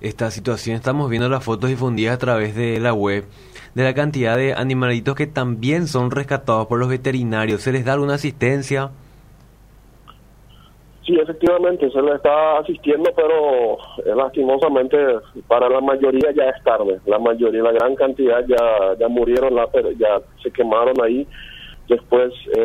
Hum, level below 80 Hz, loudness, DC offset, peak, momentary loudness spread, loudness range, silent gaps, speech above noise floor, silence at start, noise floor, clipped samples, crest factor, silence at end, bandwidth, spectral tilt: none; -46 dBFS; -18 LUFS; under 0.1%; -2 dBFS; 6 LU; 5 LU; none; 29 dB; 0 s; -47 dBFS; under 0.1%; 16 dB; 0 s; 14.5 kHz; -7 dB/octave